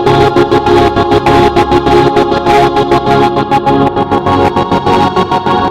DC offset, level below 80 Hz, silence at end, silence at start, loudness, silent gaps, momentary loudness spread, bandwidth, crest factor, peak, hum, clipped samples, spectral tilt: under 0.1%; -28 dBFS; 0 s; 0 s; -9 LUFS; none; 3 LU; 14 kHz; 8 dB; 0 dBFS; none; 0.7%; -6.5 dB/octave